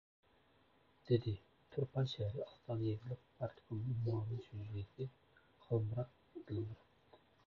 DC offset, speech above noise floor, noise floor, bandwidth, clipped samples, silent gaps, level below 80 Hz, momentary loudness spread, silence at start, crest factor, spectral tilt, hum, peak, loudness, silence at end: under 0.1%; 31 dB; -72 dBFS; 6.8 kHz; under 0.1%; none; -66 dBFS; 11 LU; 1.05 s; 20 dB; -8 dB/octave; none; -22 dBFS; -43 LUFS; 0.3 s